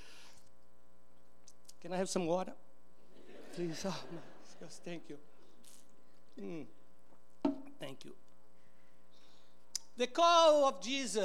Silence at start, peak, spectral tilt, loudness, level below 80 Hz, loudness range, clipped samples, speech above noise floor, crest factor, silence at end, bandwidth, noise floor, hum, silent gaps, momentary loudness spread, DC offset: 1.85 s; -16 dBFS; -3.5 dB/octave; -34 LUFS; -80 dBFS; 14 LU; under 0.1%; 35 dB; 22 dB; 0 s; 16.5 kHz; -70 dBFS; none; none; 27 LU; 0.6%